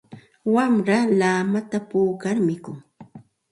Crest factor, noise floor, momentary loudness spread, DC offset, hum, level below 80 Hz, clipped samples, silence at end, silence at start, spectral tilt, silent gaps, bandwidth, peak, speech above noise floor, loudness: 16 dB; -46 dBFS; 12 LU; under 0.1%; none; -66 dBFS; under 0.1%; 0.35 s; 0.1 s; -6.5 dB/octave; none; 11.5 kHz; -8 dBFS; 25 dB; -21 LUFS